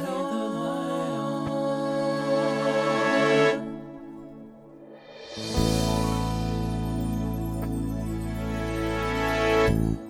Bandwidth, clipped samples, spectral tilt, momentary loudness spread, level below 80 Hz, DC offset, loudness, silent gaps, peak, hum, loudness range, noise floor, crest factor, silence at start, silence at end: 17.5 kHz; under 0.1%; -6 dB/octave; 18 LU; -38 dBFS; under 0.1%; -26 LUFS; none; -8 dBFS; none; 4 LU; -47 dBFS; 18 dB; 0 s; 0 s